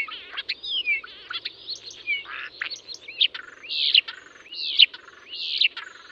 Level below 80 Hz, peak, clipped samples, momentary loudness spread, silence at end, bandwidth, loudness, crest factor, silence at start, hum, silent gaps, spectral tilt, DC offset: -72 dBFS; -2 dBFS; under 0.1%; 20 LU; 0.05 s; 8.2 kHz; -23 LUFS; 24 dB; 0 s; none; none; 1.5 dB/octave; under 0.1%